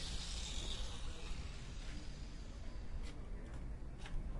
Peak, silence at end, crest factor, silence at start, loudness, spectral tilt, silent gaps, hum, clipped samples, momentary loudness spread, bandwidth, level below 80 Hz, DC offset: -30 dBFS; 0 s; 14 dB; 0 s; -49 LUFS; -3.5 dB/octave; none; none; under 0.1%; 8 LU; 11.5 kHz; -46 dBFS; under 0.1%